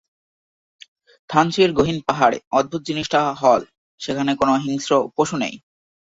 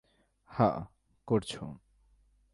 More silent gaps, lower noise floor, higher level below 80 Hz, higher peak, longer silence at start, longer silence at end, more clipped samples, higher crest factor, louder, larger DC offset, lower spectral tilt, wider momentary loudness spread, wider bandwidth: first, 2.47-2.51 s, 3.78-3.98 s vs none; first, under -90 dBFS vs -67 dBFS; first, -52 dBFS vs -60 dBFS; first, -2 dBFS vs -12 dBFS; first, 1.3 s vs 0.5 s; second, 0.55 s vs 0.75 s; neither; about the same, 20 dB vs 22 dB; first, -19 LUFS vs -32 LUFS; neither; second, -5 dB/octave vs -7 dB/octave; second, 8 LU vs 19 LU; second, 8 kHz vs 11.5 kHz